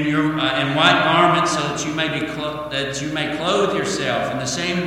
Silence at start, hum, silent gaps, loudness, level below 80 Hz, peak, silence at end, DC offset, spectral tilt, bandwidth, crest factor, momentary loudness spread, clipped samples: 0 s; none; none; -19 LUFS; -50 dBFS; 0 dBFS; 0 s; under 0.1%; -4 dB/octave; 15.5 kHz; 20 dB; 9 LU; under 0.1%